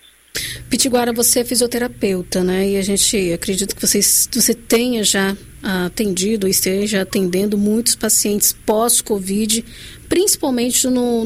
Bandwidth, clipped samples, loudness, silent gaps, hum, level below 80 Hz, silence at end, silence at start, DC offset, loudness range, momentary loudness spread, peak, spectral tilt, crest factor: 16 kHz; under 0.1%; -16 LUFS; none; none; -42 dBFS; 0 s; 0.35 s; under 0.1%; 2 LU; 8 LU; -2 dBFS; -3 dB/octave; 14 dB